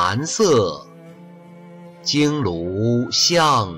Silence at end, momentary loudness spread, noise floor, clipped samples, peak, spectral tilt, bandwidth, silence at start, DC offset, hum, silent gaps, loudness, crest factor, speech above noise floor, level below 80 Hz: 0 s; 10 LU; -42 dBFS; under 0.1%; -6 dBFS; -4 dB/octave; 16 kHz; 0 s; under 0.1%; none; none; -18 LUFS; 14 dB; 24 dB; -54 dBFS